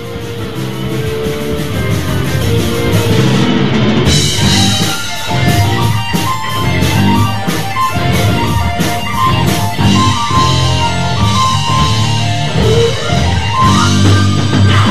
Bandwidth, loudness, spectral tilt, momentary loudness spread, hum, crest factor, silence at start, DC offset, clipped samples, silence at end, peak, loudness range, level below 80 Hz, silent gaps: 14 kHz; -12 LUFS; -5 dB/octave; 7 LU; none; 12 dB; 0 s; 9%; under 0.1%; 0 s; 0 dBFS; 2 LU; -28 dBFS; none